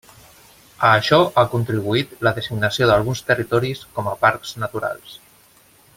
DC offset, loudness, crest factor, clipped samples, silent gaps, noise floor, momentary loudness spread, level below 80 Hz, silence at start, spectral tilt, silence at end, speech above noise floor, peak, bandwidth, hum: under 0.1%; -19 LUFS; 18 dB; under 0.1%; none; -52 dBFS; 12 LU; -50 dBFS; 0.8 s; -5.5 dB/octave; 0.8 s; 34 dB; -2 dBFS; 16.5 kHz; none